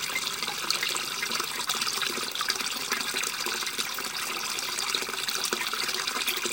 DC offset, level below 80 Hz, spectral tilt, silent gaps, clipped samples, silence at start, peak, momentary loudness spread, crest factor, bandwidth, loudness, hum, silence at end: under 0.1%; -72 dBFS; 0.5 dB/octave; none; under 0.1%; 0 s; -6 dBFS; 2 LU; 24 dB; 17 kHz; -28 LUFS; none; 0 s